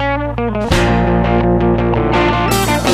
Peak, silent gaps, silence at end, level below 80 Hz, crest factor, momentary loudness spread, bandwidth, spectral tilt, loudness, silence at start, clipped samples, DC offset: 0 dBFS; none; 0 s; -24 dBFS; 12 dB; 5 LU; 15.5 kHz; -5.5 dB/octave; -14 LUFS; 0 s; under 0.1%; under 0.1%